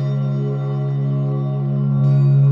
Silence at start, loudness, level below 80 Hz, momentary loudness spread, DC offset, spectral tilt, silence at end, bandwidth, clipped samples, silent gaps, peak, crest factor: 0 s; -19 LUFS; -62 dBFS; 7 LU; under 0.1%; -11.5 dB/octave; 0 s; 3.9 kHz; under 0.1%; none; -8 dBFS; 10 dB